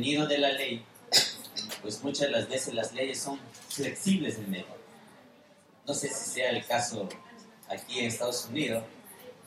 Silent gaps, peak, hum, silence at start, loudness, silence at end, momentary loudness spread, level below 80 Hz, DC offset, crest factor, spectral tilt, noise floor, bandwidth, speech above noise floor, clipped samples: none; -6 dBFS; none; 0 s; -31 LUFS; 0 s; 15 LU; -74 dBFS; under 0.1%; 26 dB; -3 dB/octave; -59 dBFS; 16 kHz; 27 dB; under 0.1%